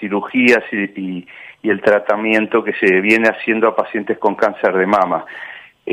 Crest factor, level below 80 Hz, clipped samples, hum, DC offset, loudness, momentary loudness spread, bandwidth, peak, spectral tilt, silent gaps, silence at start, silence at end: 16 dB; -64 dBFS; under 0.1%; none; under 0.1%; -15 LUFS; 14 LU; 13 kHz; 0 dBFS; -6 dB/octave; none; 0 s; 0 s